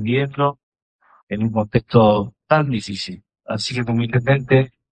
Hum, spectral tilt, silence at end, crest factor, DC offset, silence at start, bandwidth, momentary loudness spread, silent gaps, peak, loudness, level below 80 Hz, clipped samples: none; -7 dB/octave; 0.25 s; 18 dB; under 0.1%; 0 s; 9.2 kHz; 14 LU; 0.63-0.72 s, 0.82-0.99 s, 1.23-1.27 s; 0 dBFS; -19 LUFS; -48 dBFS; under 0.1%